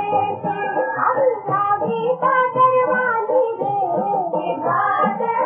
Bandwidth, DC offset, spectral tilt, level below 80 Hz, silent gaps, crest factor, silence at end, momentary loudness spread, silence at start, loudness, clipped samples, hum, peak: 3.5 kHz; under 0.1%; -9.5 dB/octave; -68 dBFS; none; 14 dB; 0 s; 6 LU; 0 s; -19 LUFS; under 0.1%; none; -4 dBFS